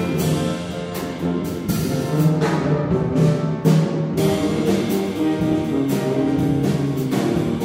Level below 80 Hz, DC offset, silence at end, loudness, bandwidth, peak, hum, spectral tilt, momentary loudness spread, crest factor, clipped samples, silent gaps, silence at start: -44 dBFS; under 0.1%; 0 s; -20 LUFS; 16.5 kHz; -4 dBFS; none; -7 dB/octave; 6 LU; 16 dB; under 0.1%; none; 0 s